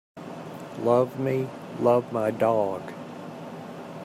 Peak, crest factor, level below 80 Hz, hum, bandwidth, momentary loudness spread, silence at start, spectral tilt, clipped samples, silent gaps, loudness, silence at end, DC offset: -8 dBFS; 18 dB; -72 dBFS; none; 15.5 kHz; 16 LU; 0.15 s; -7.5 dB/octave; under 0.1%; none; -25 LUFS; 0 s; under 0.1%